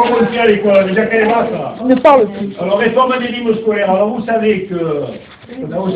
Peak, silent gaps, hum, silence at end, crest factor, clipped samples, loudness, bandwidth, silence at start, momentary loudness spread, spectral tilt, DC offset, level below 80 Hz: 0 dBFS; none; none; 0 s; 12 dB; under 0.1%; -13 LUFS; 5.2 kHz; 0 s; 11 LU; -8.5 dB/octave; under 0.1%; -50 dBFS